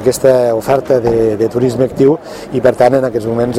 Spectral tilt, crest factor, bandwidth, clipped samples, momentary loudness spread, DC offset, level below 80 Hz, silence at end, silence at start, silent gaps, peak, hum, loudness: -6.5 dB/octave; 12 dB; 16 kHz; under 0.1%; 5 LU; under 0.1%; -40 dBFS; 0 s; 0 s; none; 0 dBFS; none; -12 LUFS